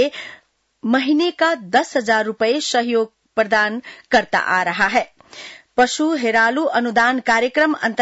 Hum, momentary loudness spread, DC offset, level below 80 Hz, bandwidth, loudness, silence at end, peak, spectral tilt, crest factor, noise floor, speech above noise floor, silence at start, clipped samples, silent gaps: none; 11 LU; under 0.1%; -60 dBFS; 8 kHz; -18 LUFS; 0 s; -4 dBFS; -3 dB/octave; 14 dB; -39 dBFS; 21 dB; 0 s; under 0.1%; none